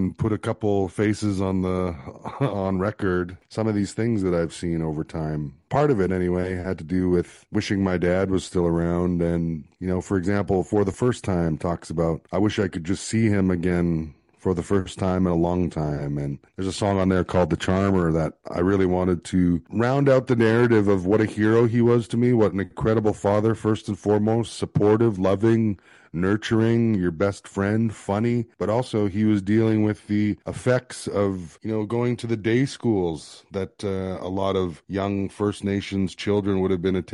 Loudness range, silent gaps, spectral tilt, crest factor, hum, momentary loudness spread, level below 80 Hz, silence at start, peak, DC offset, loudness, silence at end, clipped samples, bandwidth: 5 LU; none; -7 dB/octave; 16 dB; none; 8 LU; -48 dBFS; 0 s; -8 dBFS; under 0.1%; -23 LUFS; 0.1 s; under 0.1%; 11.5 kHz